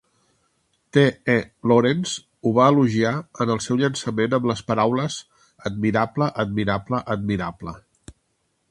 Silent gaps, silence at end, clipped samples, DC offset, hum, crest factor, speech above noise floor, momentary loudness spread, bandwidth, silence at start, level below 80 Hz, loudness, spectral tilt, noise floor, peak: none; 0.9 s; under 0.1%; under 0.1%; none; 20 dB; 50 dB; 11 LU; 11.5 kHz; 0.95 s; -52 dBFS; -22 LUFS; -6 dB/octave; -71 dBFS; -2 dBFS